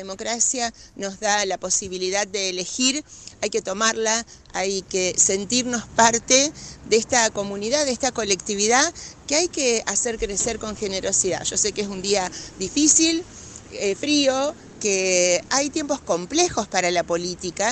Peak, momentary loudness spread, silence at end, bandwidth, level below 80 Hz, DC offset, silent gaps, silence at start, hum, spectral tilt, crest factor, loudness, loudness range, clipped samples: 0 dBFS; 10 LU; 0 s; 9.8 kHz; -50 dBFS; under 0.1%; none; 0 s; none; -1.5 dB/octave; 22 dB; -21 LUFS; 3 LU; under 0.1%